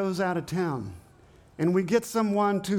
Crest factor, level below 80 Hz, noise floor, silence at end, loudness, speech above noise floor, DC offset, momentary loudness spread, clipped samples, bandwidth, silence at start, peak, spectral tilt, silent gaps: 16 dB; -62 dBFS; -55 dBFS; 0 s; -27 LUFS; 29 dB; under 0.1%; 7 LU; under 0.1%; 18 kHz; 0 s; -10 dBFS; -6.5 dB/octave; none